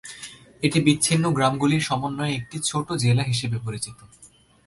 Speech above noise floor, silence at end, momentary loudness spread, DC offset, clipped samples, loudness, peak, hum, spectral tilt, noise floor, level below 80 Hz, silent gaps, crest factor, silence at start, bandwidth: 20 dB; 0.4 s; 13 LU; under 0.1%; under 0.1%; -23 LUFS; -4 dBFS; none; -4.5 dB/octave; -43 dBFS; -54 dBFS; none; 18 dB; 0.05 s; 11.5 kHz